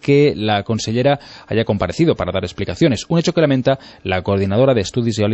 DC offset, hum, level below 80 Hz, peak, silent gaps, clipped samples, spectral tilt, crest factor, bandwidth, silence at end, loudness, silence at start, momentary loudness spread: under 0.1%; none; -44 dBFS; -2 dBFS; none; under 0.1%; -6 dB/octave; 14 dB; 8.4 kHz; 0 s; -17 LUFS; 0 s; 8 LU